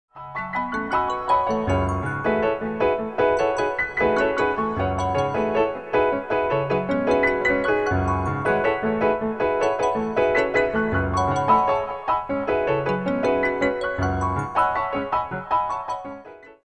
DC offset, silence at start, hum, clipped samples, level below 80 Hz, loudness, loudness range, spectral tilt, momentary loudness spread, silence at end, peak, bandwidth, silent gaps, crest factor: 0.2%; 0.15 s; none; under 0.1%; -44 dBFS; -22 LUFS; 2 LU; -6.5 dB/octave; 5 LU; 0.2 s; -6 dBFS; 10 kHz; none; 16 dB